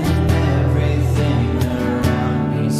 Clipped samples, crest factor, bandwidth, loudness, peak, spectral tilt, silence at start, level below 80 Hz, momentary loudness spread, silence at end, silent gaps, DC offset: under 0.1%; 12 dB; 15 kHz; -18 LUFS; -4 dBFS; -7.5 dB/octave; 0 s; -26 dBFS; 3 LU; 0 s; none; under 0.1%